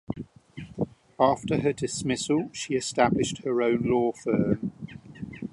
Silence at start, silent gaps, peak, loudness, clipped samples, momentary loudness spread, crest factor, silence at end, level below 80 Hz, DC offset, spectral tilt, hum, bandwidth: 0.1 s; none; -6 dBFS; -26 LUFS; under 0.1%; 17 LU; 20 dB; 0.05 s; -54 dBFS; under 0.1%; -5.5 dB/octave; none; 11.5 kHz